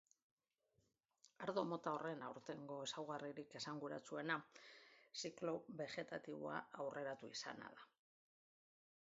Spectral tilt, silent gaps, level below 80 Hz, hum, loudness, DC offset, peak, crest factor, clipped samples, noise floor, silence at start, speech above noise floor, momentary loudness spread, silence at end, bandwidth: -3 dB/octave; none; under -90 dBFS; none; -49 LUFS; under 0.1%; -28 dBFS; 24 dB; under 0.1%; -85 dBFS; 1.4 s; 37 dB; 12 LU; 1.35 s; 7.6 kHz